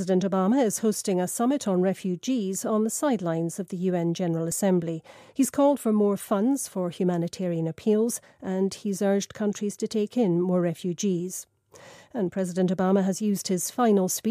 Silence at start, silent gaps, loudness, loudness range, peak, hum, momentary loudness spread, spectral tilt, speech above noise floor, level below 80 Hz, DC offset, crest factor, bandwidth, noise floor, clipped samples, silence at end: 0 s; none; -26 LUFS; 2 LU; -12 dBFS; none; 7 LU; -6 dB/octave; 25 dB; -72 dBFS; under 0.1%; 14 dB; 15.5 kHz; -50 dBFS; under 0.1%; 0 s